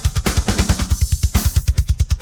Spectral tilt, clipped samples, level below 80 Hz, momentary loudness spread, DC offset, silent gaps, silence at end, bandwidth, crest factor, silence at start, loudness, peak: -4.5 dB/octave; under 0.1%; -20 dBFS; 2 LU; under 0.1%; none; 0 s; over 20 kHz; 14 dB; 0 s; -19 LUFS; -4 dBFS